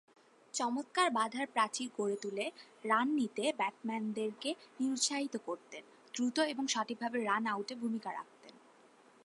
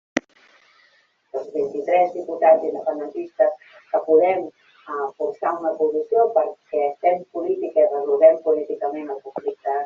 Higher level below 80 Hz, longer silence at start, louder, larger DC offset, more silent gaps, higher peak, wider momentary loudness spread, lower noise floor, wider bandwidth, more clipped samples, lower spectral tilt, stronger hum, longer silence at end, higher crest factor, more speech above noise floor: second, under -90 dBFS vs -70 dBFS; first, 0.55 s vs 0.15 s; second, -36 LUFS vs -21 LUFS; neither; neither; second, -16 dBFS vs -2 dBFS; about the same, 12 LU vs 13 LU; about the same, -63 dBFS vs -60 dBFS; first, 11.5 kHz vs 7.2 kHz; neither; about the same, -2.5 dB/octave vs -3.5 dB/octave; neither; first, 0.65 s vs 0 s; about the same, 20 dB vs 18 dB; second, 28 dB vs 40 dB